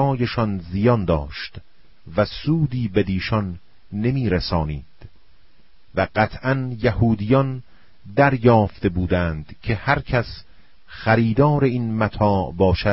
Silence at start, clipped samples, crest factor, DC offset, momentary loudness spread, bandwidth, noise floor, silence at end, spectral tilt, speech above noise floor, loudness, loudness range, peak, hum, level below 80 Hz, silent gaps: 0 s; under 0.1%; 18 dB; 0.8%; 12 LU; 5.8 kHz; -57 dBFS; 0 s; -11 dB/octave; 37 dB; -21 LUFS; 4 LU; -2 dBFS; none; -38 dBFS; none